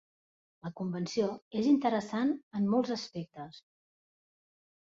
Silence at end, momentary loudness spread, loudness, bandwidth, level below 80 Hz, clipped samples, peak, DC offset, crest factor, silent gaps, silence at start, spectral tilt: 1.25 s; 17 LU; -32 LUFS; 7.8 kHz; -76 dBFS; under 0.1%; -16 dBFS; under 0.1%; 18 dB; 1.42-1.51 s, 2.43-2.51 s; 0.65 s; -6.5 dB/octave